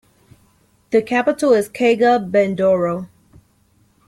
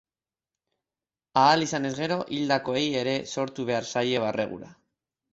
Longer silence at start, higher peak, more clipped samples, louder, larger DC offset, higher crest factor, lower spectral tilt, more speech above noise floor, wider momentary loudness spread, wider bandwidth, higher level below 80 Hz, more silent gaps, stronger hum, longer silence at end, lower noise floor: second, 0.9 s vs 1.35 s; about the same, -4 dBFS vs -6 dBFS; neither; first, -17 LUFS vs -26 LUFS; neither; second, 14 dB vs 22 dB; first, -6 dB/octave vs -4.5 dB/octave; second, 42 dB vs over 64 dB; second, 7 LU vs 10 LU; first, 14 kHz vs 8.2 kHz; first, -58 dBFS vs -66 dBFS; neither; neither; first, 1 s vs 0.6 s; second, -58 dBFS vs under -90 dBFS